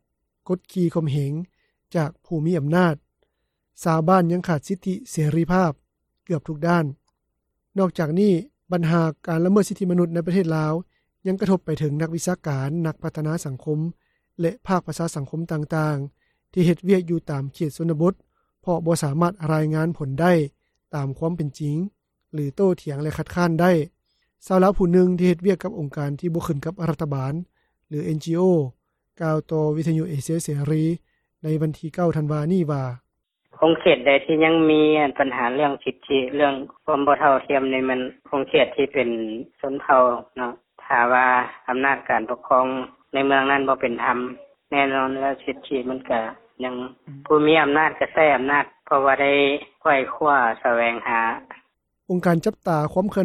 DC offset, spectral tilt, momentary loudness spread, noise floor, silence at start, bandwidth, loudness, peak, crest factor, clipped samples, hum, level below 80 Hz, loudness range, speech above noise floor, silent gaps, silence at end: under 0.1%; -6.5 dB/octave; 12 LU; -76 dBFS; 0.5 s; 14 kHz; -22 LUFS; -2 dBFS; 20 dB; under 0.1%; none; -52 dBFS; 6 LU; 55 dB; none; 0 s